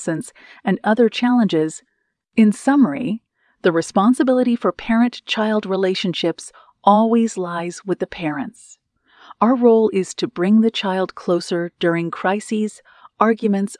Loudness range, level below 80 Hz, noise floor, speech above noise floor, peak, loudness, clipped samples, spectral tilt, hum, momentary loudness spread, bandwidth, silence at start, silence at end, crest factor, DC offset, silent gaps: 2 LU; -60 dBFS; -50 dBFS; 32 dB; 0 dBFS; -19 LUFS; under 0.1%; -5.5 dB/octave; none; 11 LU; 12 kHz; 0 s; 0.05 s; 18 dB; under 0.1%; none